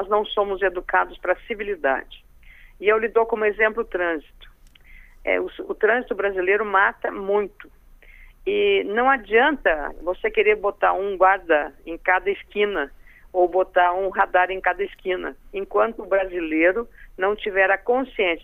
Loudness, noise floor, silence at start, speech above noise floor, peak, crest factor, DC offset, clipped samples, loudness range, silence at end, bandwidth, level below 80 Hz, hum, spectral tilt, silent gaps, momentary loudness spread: -22 LUFS; -48 dBFS; 0 s; 26 dB; -4 dBFS; 18 dB; under 0.1%; under 0.1%; 3 LU; 0 s; 3.9 kHz; -46 dBFS; none; -6 dB/octave; none; 9 LU